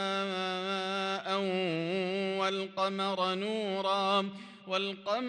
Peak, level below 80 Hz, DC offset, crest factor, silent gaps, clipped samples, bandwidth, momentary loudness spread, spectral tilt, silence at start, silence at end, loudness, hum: -16 dBFS; -82 dBFS; under 0.1%; 16 dB; none; under 0.1%; 10 kHz; 3 LU; -5 dB/octave; 0 s; 0 s; -32 LUFS; none